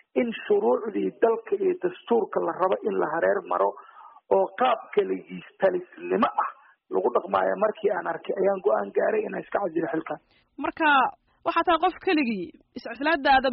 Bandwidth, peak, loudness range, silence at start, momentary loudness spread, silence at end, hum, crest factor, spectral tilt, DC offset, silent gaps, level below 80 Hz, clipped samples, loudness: 5.4 kHz; -8 dBFS; 1 LU; 0.15 s; 10 LU; 0 s; none; 16 dB; -3 dB/octave; under 0.1%; none; -62 dBFS; under 0.1%; -25 LUFS